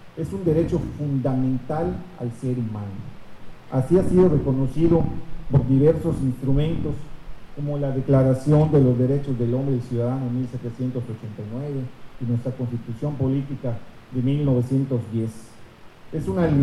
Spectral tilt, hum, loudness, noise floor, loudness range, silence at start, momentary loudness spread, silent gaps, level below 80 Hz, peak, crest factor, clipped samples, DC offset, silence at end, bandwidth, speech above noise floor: -9.5 dB/octave; none; -23 LUFS; -43 dBFS; 7 LU; 0 s; 14 LU; none; -40 dBFS; -4 dBFS; 18 dB; under 0.1%; under 0.1%; 0 s; 11.5 kHz; 22 dB